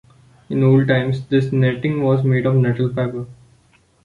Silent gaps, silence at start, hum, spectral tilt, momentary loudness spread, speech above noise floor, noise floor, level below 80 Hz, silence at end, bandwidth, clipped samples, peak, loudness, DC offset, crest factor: none; 0.5 s; none; -9.5 dB/octave; 10 LU; 39 dB; -56 dBFS; -52 dBFS; 0.7 s; 4.9 kHz; under 0.1%; -2 dBFS; -18 LUFS; under 0.1%; 16 dB